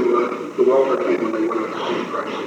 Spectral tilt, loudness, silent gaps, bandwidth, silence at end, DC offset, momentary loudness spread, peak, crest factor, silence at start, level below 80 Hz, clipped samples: -5.5 dB/octave; -20 LUFS; none; 8.8 kHz; 0 s; under 0.1%; 7 LU; -6 dBFS; 14 dB; 0 s; -84 dBFS; under 0.1%